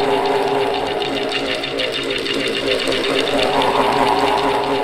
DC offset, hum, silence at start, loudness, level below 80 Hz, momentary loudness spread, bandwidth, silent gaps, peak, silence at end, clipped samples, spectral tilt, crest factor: under 0.1%; none; 0 s; -18 LUFS; -44 dBFS; 4 LU; 15.5 kHz; none; -2 dBFS; 0 s; under 0.1%; -3.5 dB/octave; 16 dB